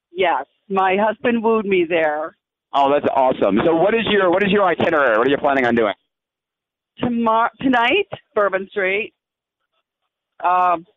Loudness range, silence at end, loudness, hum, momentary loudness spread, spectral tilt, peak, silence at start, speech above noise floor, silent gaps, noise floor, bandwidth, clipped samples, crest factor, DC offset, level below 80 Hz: 4 LU; 0.15 s; -18 LUFS; none; 8 LU; -7 dB/octave; -6 dBFS; 0.15 s; 68 dB; none; -85 dBFS; 7.2 kHz; under 0.1%; 12 dB; under 0.1%; -56 dBFS